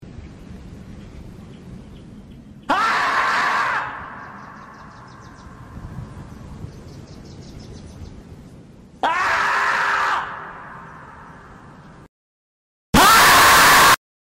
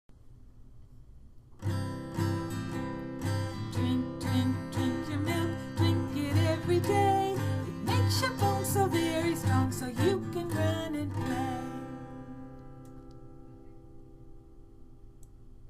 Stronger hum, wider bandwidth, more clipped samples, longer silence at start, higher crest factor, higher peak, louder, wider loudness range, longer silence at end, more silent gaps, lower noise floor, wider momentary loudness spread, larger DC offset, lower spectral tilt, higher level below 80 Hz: neither; about the same, 16.5 kHz vs 15.5 kHz; neither; about the same, 0.05 s vs 0.1 s; about the same, 16 dB vs 18 dB; first, -6 dBFS vs -14 dBFS; first, -15 LUFS vs -31 LUFS; first, 23 LU vs 11 LU; first, 0.4 s vs 0 s; first, 12.09-12.93 s vs none; second, -43 dBFS vs -52 dBFS; first, 30 LU vs 17 LU; neither; second, -2 dB/octave vs -6 dB/octave; first, -42 dBFS vs -52 dBFS